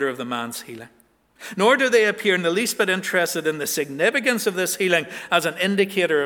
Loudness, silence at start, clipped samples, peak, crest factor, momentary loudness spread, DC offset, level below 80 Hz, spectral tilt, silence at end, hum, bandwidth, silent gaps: -21 LUFS; 0 s; under 0.1%; -2 dBFS; 20 dB; 12 LU; under 0.1%; -72 dBFS; -3 dB/octave; 0 s; none; 20 kHz; none